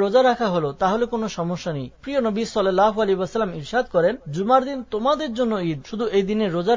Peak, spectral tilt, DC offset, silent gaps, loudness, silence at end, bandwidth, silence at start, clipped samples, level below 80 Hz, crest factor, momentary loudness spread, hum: -4 dBFS; -6 dB/octave; under 0.1%; none; -22 LUFS; 0 s; 7.6 kHz; 0 s; under 0.1%; -52 dBFS; 16 dB; 8 LU; none